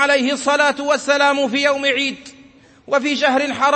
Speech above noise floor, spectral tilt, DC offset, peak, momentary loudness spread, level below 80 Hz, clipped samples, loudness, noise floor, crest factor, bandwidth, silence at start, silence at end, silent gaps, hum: 30 dB; -2 dB/octave; under 0.1%; -2 dBFS; 5 LU; -64 dBFS; under 0.1%; -17 LUFS; -47 dBFS; 16 dB; 8.8 kHz; 0 s; 0 s; none; none